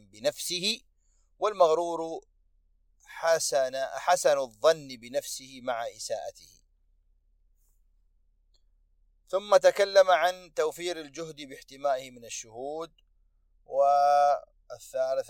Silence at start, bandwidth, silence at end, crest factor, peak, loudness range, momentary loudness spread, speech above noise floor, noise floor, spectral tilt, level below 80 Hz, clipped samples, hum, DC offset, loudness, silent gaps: 0.15 s; 16.5 kHz; 0.05 s; 20 dB; -8 dBFS; 12 LU; 18 LU; 39 dB; -67 dBFS; -2 dB/octave; -66 dBFS; under 0.1%; none; under 0.1%; -27 LUFS; none